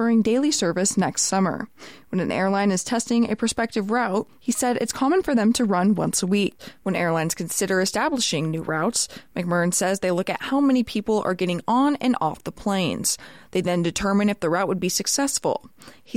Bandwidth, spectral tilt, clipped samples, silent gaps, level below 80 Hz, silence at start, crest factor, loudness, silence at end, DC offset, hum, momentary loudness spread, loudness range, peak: 16.5 kHz; -4 dB/octave; under 0.1%; none; -54 dBFS; 0 s; 14 dB; -23 LUFS; 0 s; 0.2%; none; 7 LU; 1 LU; -8 dBFS